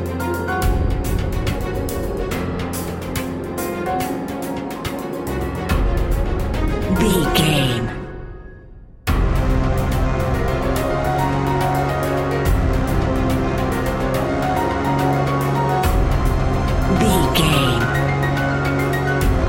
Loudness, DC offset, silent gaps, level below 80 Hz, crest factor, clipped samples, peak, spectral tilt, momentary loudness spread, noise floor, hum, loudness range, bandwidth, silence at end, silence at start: -20 LUFS; under 0.1%; none; -24 dBFS; 16 dB; under 0.1%; -2 dBFS; -6 dB/octave; 9 LU; -40 dBFS; none; 6 LU; 17 kHz; 0 s; 0 s